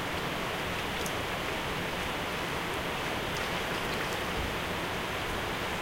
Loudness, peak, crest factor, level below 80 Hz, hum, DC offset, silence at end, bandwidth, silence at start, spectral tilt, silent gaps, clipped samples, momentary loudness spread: -32 LUFS; -18 dBFS; 14 dB; -46 dBFS; none; under 0.1%; 0 s; 16 kHz; 0 s; -3.5 dB/octave; none; under 0.1%; 1 LU